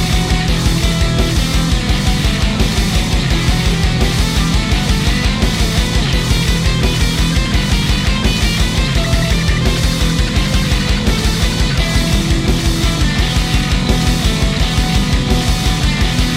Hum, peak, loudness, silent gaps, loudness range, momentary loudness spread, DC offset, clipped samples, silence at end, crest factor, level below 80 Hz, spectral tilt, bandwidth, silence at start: none; 0 dBFS; -15 LUFS; none; 0 LU; 1 LU; under 0.1%; under 0.1%; 0 s; 12 dB; -16 dBFS; -4.5 dB/octave; 16 kHz; 0 s